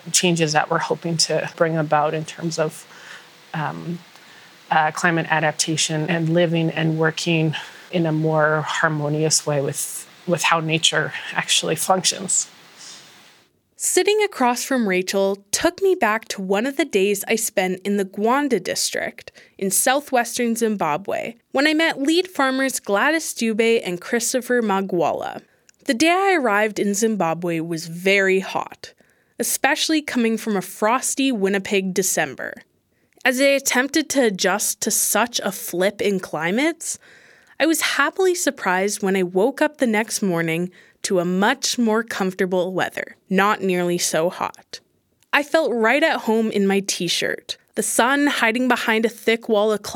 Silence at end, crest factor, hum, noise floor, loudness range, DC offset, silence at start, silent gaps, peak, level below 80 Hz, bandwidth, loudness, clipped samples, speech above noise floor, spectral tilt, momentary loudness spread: 0 s; 20 dB; none; -61 dBFS; 2 LU; under 0.1%; 0.05 s; none; -2 dBFS; -68 dBFS; 19 kHz; -20 LUFS; under 0.1%; 41 dB; -3.5 dB/octave; 10 LU